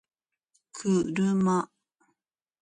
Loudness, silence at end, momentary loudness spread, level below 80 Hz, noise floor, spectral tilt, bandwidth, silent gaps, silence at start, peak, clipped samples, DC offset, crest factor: -27 LUFS; 0.95 s; 14 LU; -68 dBFS; -84 dBFS; -6.5 dB/octave; 9.8 kHz; none; 0.75 s; -14 dBFS; under 0.1%; under 0.1%; 14 dB